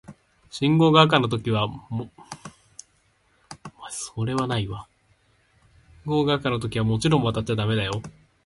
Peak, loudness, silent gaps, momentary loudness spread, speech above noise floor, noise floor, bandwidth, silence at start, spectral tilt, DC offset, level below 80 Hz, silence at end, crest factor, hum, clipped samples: -2 dBFS; -23 LUFS; none; 24 LU; 42 dB; -64 dBFS; 11.5 kHz; 0.1 s; -6 dB/octave; under 0.1%; -50 dBFS; 0.35 s; 24 dB; none; under 0.1%